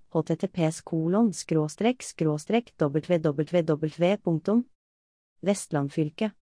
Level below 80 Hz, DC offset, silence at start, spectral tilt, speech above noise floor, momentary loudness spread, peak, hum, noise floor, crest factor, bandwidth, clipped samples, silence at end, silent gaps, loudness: -68 dBFS; under 0.1%; 0.15 s; -6.5 dB/octave; over 64 dB; 4 LU; -12 dBFS; none; under -90 dBFS; 16 dB; 10.5 kHz; under 0.1%; 0.2 s; 4.75-5.36 s; -27 LUFS